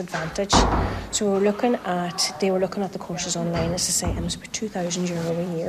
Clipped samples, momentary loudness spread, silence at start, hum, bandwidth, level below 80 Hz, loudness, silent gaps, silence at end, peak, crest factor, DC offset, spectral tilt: under 0.1%; 9 LU; 0 s; none; 14 kHz; -36 dBFS; -24 LUFS; none; 0 s; -2 dBFS; 20 dB; under 0.1%; -4 dB/octave